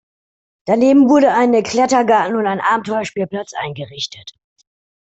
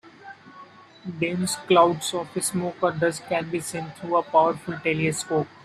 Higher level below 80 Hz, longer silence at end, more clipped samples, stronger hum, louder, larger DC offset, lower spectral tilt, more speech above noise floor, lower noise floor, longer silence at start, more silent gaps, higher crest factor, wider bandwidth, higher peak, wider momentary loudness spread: about the same, -58 dBFS vs -62 dBFS; first, 0.75 s vs 0.15 s; neither; neither; first, -15 LUFS vs -24 LUFS; neither; about the same, -5 dB/octave vs -4.5 dB/octave; first, over 75 dB vs 23 dB; first, under -90 dBFS vs -47 dBFS; first, 0.65 s vs 0.05 s; neither; second, 14 dB vs 20 dB; second, 8.2 kHz vs 15 kHz; about the same, -2 dBFS vs -4 dBFS; second, 15 LU vs 19 LU